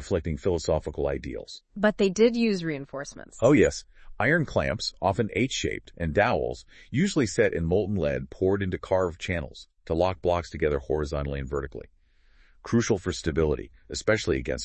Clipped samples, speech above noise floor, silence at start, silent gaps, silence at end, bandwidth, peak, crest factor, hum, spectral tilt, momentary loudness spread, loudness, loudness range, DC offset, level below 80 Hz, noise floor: under 0.1%; 32 dB; 0 s; none; 0 s; 8.8 kHz; -8 dBFS; 18 dB; none; -5.5 dB/octave; 13 LU; -26 LUFS; 5 LU; under 0.1%; -44 dBFS; -59 dBFS